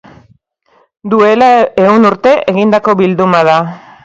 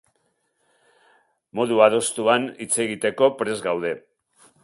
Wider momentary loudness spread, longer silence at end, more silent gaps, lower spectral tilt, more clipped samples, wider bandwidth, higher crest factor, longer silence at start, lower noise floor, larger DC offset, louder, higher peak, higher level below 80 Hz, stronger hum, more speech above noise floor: second, 6 LU vs 10 LU; second, 0.25 s vs 0.65 s; neither; first, -7 dB/octave vs -3 dB/octave; first, 0.3% vs under 0.1%; second, 7.8 kHz vs 11.5 kHz; second, 10 dB vs 22 dB; second, 1.05 s vs 1.55 s; second, -52 dBFS vs -70 dBFS; neither; first, -9 LUFS vs -21 LUFS; about the same, 0 dBFS vs -2 dBFS; first, -52 dBFS vs -68 dBFS; neither; second, 44 dB vs 49 dB